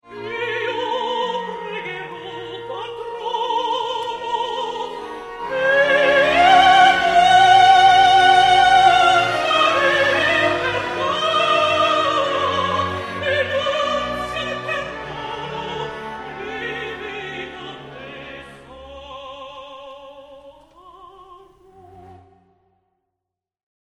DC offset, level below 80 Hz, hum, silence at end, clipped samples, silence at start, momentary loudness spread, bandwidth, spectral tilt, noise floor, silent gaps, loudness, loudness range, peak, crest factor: under 0.1%; -50 dBFS; none; 1.65 s; under 0.1%; 0.1 s; 22 LU; 12 kHz; -3 dB/octave; -84 dBFS; none; -16 LUFS; 19 LU; -2 dBFS; 18 dB